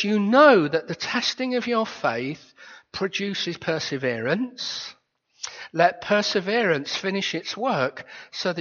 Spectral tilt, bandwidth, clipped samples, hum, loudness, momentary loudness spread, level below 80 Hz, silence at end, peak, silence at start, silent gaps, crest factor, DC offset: -2.5 dB/octave; 7.2 kHz; under 0.1%; none; -23 LUFS; 14 LU; -68 dBFS; 0 s; -2 dBFS; 0 s; none; 20 dB; under 0.1%